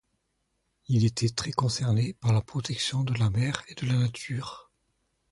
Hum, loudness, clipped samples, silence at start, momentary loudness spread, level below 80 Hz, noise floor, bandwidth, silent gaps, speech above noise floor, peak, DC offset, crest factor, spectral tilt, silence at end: none; -28 LUFS; under 0.1%; 0.9 s; 9 LU; -54 dBFS; -76 dBFS; 11.5 kHz; none; 50 dB; -8 dBFS; under 0.1%; 20 dB; -5.5 dB/octave; 0.7 s